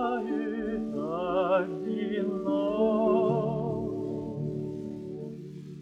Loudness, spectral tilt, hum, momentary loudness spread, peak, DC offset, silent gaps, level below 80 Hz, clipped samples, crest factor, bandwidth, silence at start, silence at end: -30 LUFS; -9 dB/octave; none; 13 LU; -14 dBFS; under 0.1%; none; -58 dBFS; under 0.1%; 16 dB; 8 kHz; 0 s; 0 s